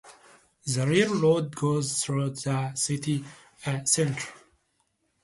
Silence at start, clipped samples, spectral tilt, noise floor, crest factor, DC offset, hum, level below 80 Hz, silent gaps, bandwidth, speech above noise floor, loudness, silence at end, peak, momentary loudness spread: 0.05 s; under 0.1%; -4.5 dB/octave; -73 dBFS; 20 dB; under 0.1%; none; -64 dBFS; none; 11.5 kHz; 47 dB; -26 LUFS; 0.85 s; -8 dBFS; 12 LU